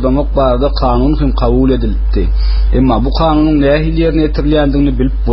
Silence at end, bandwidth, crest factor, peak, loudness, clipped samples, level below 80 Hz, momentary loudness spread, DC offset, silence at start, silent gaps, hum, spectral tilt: 0 s; 5.8 kHz; 10 dB; 0 dBFS; -12 LUFS; under 0.1%; -14 dBFS; 4 LU; under 0.1%; 0 s; none; none; -7 dB/octave